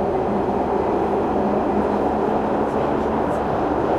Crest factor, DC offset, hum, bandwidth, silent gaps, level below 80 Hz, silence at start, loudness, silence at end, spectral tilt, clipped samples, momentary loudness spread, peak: 12 dB; under 0.1%; none; 12 kHz; none; -40 dBFS; 0 s; -21 LUFS; 0 s; -8 dB/octave; under 0.1%; 1 LU; -8 dBFS